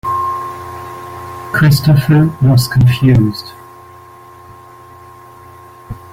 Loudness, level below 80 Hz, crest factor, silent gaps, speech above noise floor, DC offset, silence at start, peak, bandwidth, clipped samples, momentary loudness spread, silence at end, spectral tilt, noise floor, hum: -12 LUFS; -36 dBFS; 14 dB; none; 28 dB; under 0.1%; 0.05 s; -2 dBFS; 16.5 kHz; under 0.1%; 18 LU; 0.15 s; -6.5 dB/octave; -37 dBFS; none